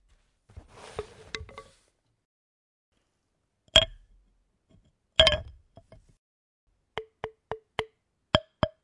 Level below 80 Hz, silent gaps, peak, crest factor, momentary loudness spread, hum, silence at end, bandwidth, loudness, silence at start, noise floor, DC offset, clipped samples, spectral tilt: -48 dBFS; 2.25-2.92 s, 6.18-6.67 s; -2 dBFS; 32 dB; 21 LU; none; 0.15 s; 11.5 kHz; -25 LUFS; 0.95 s; -77 dBFS; under 0.1%; under 0.1%; -3 dB/octave